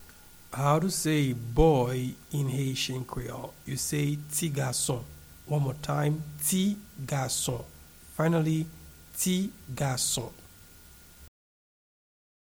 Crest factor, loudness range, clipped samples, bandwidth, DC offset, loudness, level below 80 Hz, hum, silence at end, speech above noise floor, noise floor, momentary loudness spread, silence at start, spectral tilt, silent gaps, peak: 22 dB; 5 LU; under 0.1%; over 20 kHz; under 0.1%; -29 LUFS; -46 dBFS; none; 1.3 s; 24 dB; -53 dBFS; 14 LU; 0 s; -5 dB/octave; none; -8 dBFS